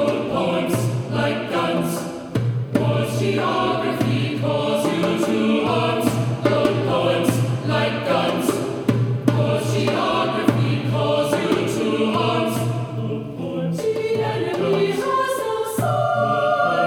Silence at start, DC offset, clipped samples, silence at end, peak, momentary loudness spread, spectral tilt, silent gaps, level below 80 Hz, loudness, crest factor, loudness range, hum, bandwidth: 0 s; under 0.1%; under 0.1%; 0 s; -2 dBFS; 4 LU; -6 dB/octave; none; -56 dBFS; -21 LUFS; 18 dB; 2 LU; none; 18 kHz